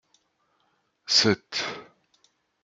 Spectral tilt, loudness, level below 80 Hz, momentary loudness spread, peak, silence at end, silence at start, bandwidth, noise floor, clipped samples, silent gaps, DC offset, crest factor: -2.5 dB/octave; -23 LUFS; -72 dBFS; 22 LU; -8 dBFS; 0.8 s; 1.1 s; 12 kHz; -71 dBFS; under 0.1%; none; under 0.1%; 22 dB